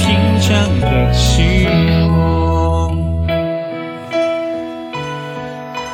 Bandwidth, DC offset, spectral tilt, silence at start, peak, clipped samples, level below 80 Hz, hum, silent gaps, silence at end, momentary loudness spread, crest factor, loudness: 14.5 kHz; under 0.1%; -6 dB/octave; 0 s; 0 dBFS; under 0.1%; -22 dBFS; none; none; 0 s; 12 LU; 14 dB; -15 LUFS